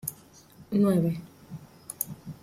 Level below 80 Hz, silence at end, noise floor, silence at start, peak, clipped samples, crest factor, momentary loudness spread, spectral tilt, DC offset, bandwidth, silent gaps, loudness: -64 dBFS; 0.1 s; -53 dBFS; 0.05 s; -10 dBFS; under 0.1%; 20 dB; 21 LU; -7 dB/octave; under 0.1%; 16 kHz; none; -28 LUFS